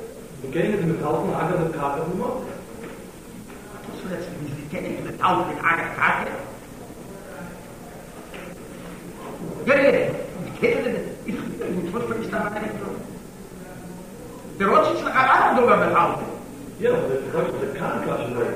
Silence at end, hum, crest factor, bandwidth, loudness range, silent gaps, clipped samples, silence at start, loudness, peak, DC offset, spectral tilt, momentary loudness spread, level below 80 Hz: 0 s; none; 20 dB; 15.5 kHz; 10 LU; none; under 0.1%; 0 s; -23 LUFS; -4 dBFS; 0.1%; -6 dB/octave; 21 LU; -50 dBFS